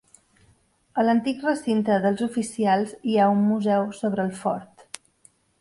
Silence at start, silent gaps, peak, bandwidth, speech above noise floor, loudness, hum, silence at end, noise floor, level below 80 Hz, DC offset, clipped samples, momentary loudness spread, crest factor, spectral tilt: 0.95 s; none; -6 dBFS; 11.5 kHz; 40 dB; -23 LUFS; none; 0.95 s; -62 dBFS; -66 dBFS; under 0.1%; under 0.1%; 12 LU; 18 dB; -6 dB/octave